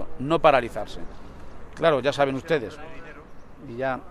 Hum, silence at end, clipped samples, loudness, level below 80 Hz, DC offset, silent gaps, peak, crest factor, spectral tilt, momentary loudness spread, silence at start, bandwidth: none; 0 s; under 0.1%; -23 LUFS; -46 dBFS; under 0.1%; none; -4 dBFS; 22 dB; -6 dB/octave; 25 LU; 0 s; 12.5 kHz